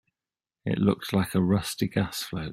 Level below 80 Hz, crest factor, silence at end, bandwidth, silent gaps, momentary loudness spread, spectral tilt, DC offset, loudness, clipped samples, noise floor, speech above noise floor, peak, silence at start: -54 dBFS; 18 dB; 0 s; 16 kHz; none; 7 LU; -6 dB/octave; under 0.1%; -27 LUFS; under 0.1%; under -90 dBFS; over 64 dB; -8 dBFS; 0.65 s